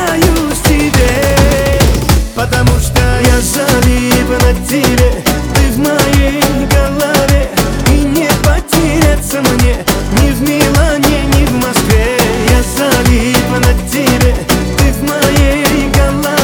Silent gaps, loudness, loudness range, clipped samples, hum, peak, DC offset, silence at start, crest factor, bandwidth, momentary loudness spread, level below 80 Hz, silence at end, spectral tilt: none; -10 LUFS; 1 LU; 0.3%; none; 0 dBFS; under 0.1%; 0 s; 10 dB; over 20 kHz; 2 LU; -14 dBFS; 0 s; -5 dB/octave